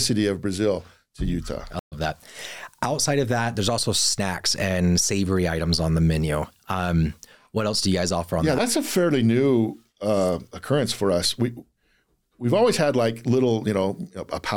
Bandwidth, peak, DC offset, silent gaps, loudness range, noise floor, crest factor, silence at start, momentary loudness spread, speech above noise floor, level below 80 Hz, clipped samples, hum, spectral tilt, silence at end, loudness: 17.5 kHz; -10 dBFS; 0.3%; 1.79-1.91 s; 3 LU; -67 dBFS; 14 dB; 0 s; 10 LU; 44 dB; -42 dBFS; under 0.1%; none; -4.5 dB/octave; 0 s; -23 LUFS